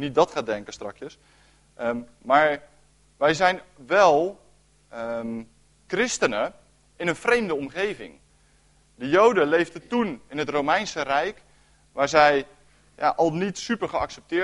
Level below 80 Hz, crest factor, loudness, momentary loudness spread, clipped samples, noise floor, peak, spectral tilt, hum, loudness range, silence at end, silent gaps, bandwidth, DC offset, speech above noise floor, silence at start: -58 dBFS; 20 dB; -23 LUFS; 17 LU; under 0.1%; -60 dBFS; -4 dBFS; -4 dB/octave; none; 4 LU; 0 s; none; 11.5 kHz; under 0.1%; 36 dB; 0 s